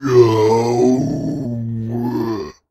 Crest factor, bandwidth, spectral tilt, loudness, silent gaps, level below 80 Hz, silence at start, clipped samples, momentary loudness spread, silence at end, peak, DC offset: 16 dB; 13.5 kHz; -7.5 dB/octave; -17 LUFS; none; -48 dBFS; 0 s; under 0.1%; 11 LU; 0.2 s; 0 dBFS; under 0.1%